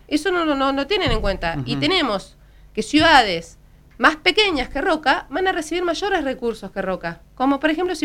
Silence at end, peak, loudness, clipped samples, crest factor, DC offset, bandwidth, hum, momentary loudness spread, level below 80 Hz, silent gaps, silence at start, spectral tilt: 0 s; 0 dBFS; -19 LUFS; under 0.1%; 20 dB; under 0.1%; 15.5 kHz; none; 11 LU; -36 dBFS; none; 0.1 s; -4 dB/octave